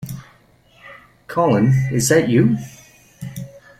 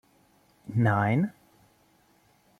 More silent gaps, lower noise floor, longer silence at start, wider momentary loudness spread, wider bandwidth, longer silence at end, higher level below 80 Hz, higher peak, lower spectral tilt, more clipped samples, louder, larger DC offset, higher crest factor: neither; second, -52 dBFS vs -64 dBFS; second, 0 s vs 0.7 s; first, 21 LU vs 11 LU; first, 15 kHz vs 6.6 kHz; second, 0.2 s vs 1.3 s; first, -50 dBFS vs -64 dBFS; first, -2 dBFS vs -12 dBFS; second, -6 dB/octave vs -9 dB/octave; neither; first, -17 LUFS vs -27 LUFS; neither; about the same, 18 dB vs 18 dB